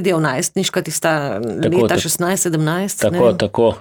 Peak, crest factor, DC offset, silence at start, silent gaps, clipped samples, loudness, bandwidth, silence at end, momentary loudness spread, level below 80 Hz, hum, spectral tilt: -2 dBFS; 14 dB; under 0.1%; 0 s; none; under 0.1%; -17 LUFS; over 20 kHz; 0 s; 4 LU; -50 dBFS; none; -4.5 dB/octave